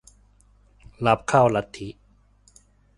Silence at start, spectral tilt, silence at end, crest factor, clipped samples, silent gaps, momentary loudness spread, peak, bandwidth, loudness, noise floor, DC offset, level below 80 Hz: 1 s; -6 dB/octave; 1.05 s; 22 dB; under 0.1%; none; 19 LU; -4 dBFS; 11.5 kHz; -21 LUFS; -58 dBFS; under 0.1%; -52 dBFS